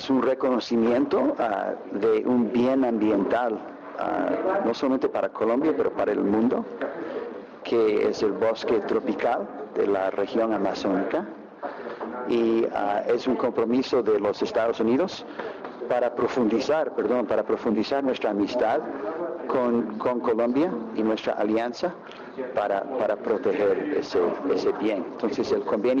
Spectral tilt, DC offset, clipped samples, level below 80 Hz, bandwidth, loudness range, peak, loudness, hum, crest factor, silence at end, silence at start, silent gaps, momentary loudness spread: -6.5 dB/octave; under 0.1%; under 0.1%; -62 dBFS; 7.4 kHz; 2 LU; -16 dBFS; -25 LUFS; none; 8 dB; 0 s; 0 s; none; 9 LU